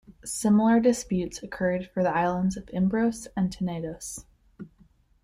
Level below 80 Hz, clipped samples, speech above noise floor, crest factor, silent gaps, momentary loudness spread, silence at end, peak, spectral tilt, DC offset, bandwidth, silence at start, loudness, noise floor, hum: -52 dBFS; under 0.1%; 35 dB; 18 dB; none; 18 LU; 0.55 s; -10 dBFS; -6 dB/octave; under 0.1%; 15 kHz; 0.1 s; -26 LUFS; -60 dBFS; none